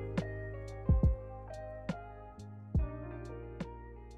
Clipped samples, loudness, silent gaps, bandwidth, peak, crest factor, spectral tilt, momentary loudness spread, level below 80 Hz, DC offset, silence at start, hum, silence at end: under 0.1%; -38 LUFS; none; 8.4 kHz; -20 dBFS; 18 dB; -8.5 dB/octave; 19 LU; -40 dBFS; under 0.1%; 0 s; none; 0 s